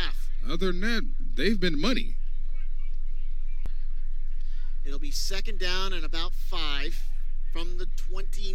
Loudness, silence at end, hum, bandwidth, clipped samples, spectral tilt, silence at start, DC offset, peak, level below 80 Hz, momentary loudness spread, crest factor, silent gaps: -33 LUFS; 0 s; none; 8 kHz; under 0.1%; -4.5 dB/octave; 0 s; under 0.1%; -10 dBFS; -24 dBFS; 10 LU; 12 dB; none